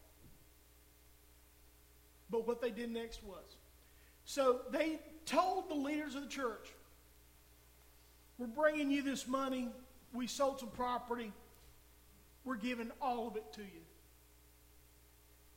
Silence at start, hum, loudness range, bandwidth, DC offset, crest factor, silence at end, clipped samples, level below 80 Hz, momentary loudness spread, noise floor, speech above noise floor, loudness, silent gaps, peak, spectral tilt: 0.1 s; none; 7 LU; 16.5 kHz; under 0.1%; 24 dB; 0.75 s; under 0.1%; -66 dBFS; 20 LU; -65 dBFS; 26 dB; -39 LUFS; none; -18 dBFS; -4 dB/octave